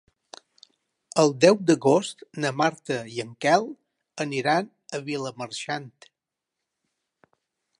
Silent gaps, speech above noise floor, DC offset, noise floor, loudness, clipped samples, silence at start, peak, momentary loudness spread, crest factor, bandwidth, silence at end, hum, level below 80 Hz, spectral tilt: none; 62 dB; under 0.1%; -86 dBFS; -24 LUFS; under 0.1%; 1.15 s; -2 dBFS; 16 LU; 24 dB; 11.5 kHz; 1.9 s; none; -78 dBFS; -4.5 dB/octave